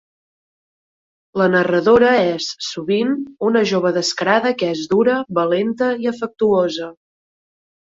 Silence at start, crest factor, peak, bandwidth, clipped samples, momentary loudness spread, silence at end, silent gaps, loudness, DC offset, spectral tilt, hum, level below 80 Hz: 1.35 s; 16 dB; -2 dBFS; 7.8 kHz; under 0.1%; 10 LU; 1 s; none; -17 LUFS; under 0.1%; -5 dB/octave; none; -58 dBFS